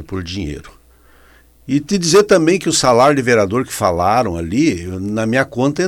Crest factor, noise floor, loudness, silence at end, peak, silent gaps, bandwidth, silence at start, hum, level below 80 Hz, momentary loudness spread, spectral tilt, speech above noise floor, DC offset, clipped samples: 16 dB; -48 dBFS; -15 LUFS; 0 s; 0 dBFS; none; 17 kHz; 0 s; none; -42 dBFS; 13 LU; -4.5 dB/octave; 33 dB; under 0.1%; under 0.1%